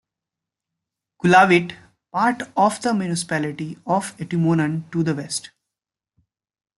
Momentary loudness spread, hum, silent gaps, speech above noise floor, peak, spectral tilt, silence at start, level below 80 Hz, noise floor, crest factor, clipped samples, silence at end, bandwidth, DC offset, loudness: 14 LU; none; none; 67 dB; -2 dBFS; -5.5 dB/octave; 1.25 s; -64 dBFS; -87 dBFS; 20 dB; under 0.1%; 1.4 s; 12 kHz; under 0.1%; -20 LUFS